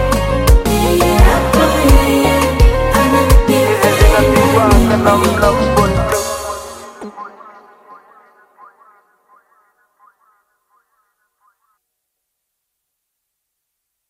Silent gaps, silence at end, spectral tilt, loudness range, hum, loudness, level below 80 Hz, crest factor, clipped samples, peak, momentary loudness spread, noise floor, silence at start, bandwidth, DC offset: none; 6.8 s; -5.5 dB/octave; 12 LU; none; -12 LUFS; -18 dBFS; 14 dB; under 0.1%; 0 dBFS; 16 LU; -75 dBFS; 0 s; 16.5 kHz; under 0.1%